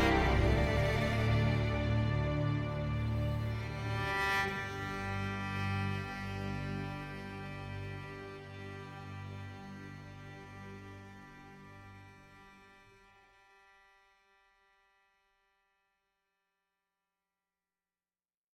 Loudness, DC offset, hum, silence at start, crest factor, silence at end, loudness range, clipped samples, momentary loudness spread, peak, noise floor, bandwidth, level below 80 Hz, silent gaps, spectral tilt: -35 LUFS; under 0.1%; none; 0 s; 20 dB; 5.8 s; 20 LU; under 0.1%; 22 LU; -16 dBFS; under -90 dBFS; 14.5 kHz; -46 dBFS; none; -6.5 dB/octave